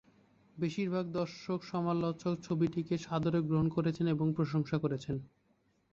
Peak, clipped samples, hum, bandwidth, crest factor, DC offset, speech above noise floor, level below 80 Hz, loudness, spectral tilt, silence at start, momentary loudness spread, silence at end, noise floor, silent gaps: -20 dBFS; under 0.1%; none; 7.4 kHz; 16 dB; under 0.1%; 40 dB; -64 dBFS; -34 LUFS; -8 dB/octave; 0.55 s; 6 LU; 0.65 s; -73 dBFS; none